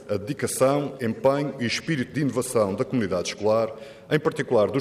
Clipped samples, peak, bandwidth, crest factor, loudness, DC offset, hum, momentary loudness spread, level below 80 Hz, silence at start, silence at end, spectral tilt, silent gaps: under 0.1%; -8 dBFS; 15.5 kHz; 16 dB; -25 LUFS; under 0.1%; none; 6 LU; -62 dBFS; 0 s; 0 s; -5 dB/octave; none